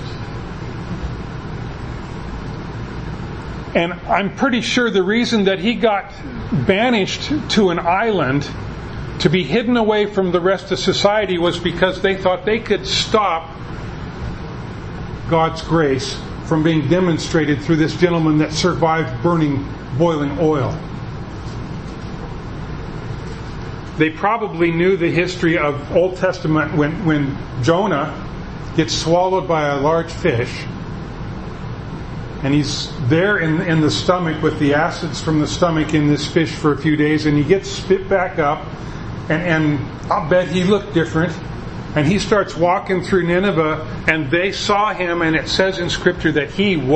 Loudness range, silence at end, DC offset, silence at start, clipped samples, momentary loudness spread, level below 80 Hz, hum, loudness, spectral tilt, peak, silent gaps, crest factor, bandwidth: 5 LU; 0 s; under 0.1%; 0 s; under 0.1%; 13 LU; -36 dBFS; none; -18 LUFS; -5.5 dB/octave; 0 dBFS; none; 18 dB; 8.8 kHz